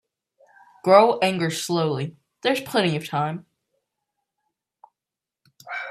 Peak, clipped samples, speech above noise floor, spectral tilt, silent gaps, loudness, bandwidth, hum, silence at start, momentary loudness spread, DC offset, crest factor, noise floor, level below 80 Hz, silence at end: 0 dBFS; under 0.1%; 68 dB; -5 dB/octave; none; -22 LUFS; 15.5 kHz; none; 0.85 s; 17 LU; under 0.1%; 24 dB; -88 dBFS; -70 dBFS; 0 s